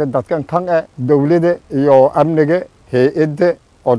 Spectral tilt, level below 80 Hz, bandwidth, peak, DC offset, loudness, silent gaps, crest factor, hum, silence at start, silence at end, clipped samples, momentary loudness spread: -9 dB/octave; -52 dBFS; 10.5 kHz; 0 dBFS; under 0.1%; -14 LUFS; none; 14 dB; none; 0 s; 0 s; 0.2%; 8 LU